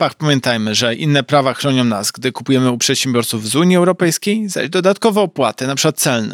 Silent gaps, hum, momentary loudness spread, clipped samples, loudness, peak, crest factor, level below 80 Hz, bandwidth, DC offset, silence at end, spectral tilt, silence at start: none; none; 5 LU; under 0.1%; -15 LUFS; -2 dBFS; 14 dB; -66 dBFS; 18 kHz; under 0.1%; 0 s; -4 dB/octave; 0 s